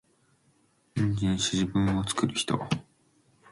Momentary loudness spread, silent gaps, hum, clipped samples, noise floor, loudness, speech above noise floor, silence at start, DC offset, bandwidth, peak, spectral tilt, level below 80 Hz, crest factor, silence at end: 7 LU; none; none; under 0.1%; -67 dBFS; -28 LUFS; 40 dB; 0.95 s; under 0.1%; 11.5 kHz; -10 dBFS; -4.5 dB/octave; -50 dBFS; 18 dB; 0.7 s